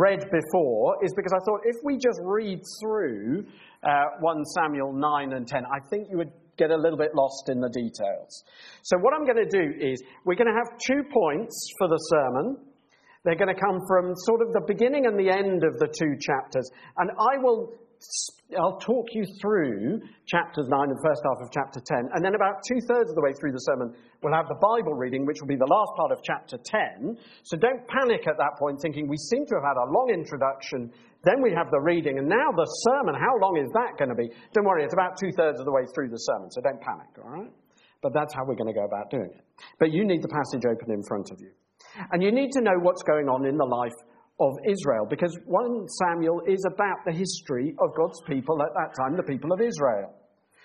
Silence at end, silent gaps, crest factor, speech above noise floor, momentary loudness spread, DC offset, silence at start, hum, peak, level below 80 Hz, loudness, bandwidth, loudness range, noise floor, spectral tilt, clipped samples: 0.55 s; none; 18 dB; 34 dB; 9 LU; under 0.1%; 0 s; none; -6 dBFS; -68 dBFS; -26 LUFS; 10 kHz; 3 LU; -60 dBFS; -5.5 dB/octave; under 0.1%